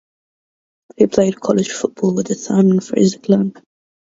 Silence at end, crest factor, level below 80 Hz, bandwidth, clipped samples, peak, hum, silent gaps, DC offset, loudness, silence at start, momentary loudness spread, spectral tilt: 0.6 s; 16 dB; -56 dBFS; 7.8 kHz; under 0.1%; 0 dBFS; none; none; under 0.1%; -16 LUFS; 1 s; 6 LU; -6.5 dB/octave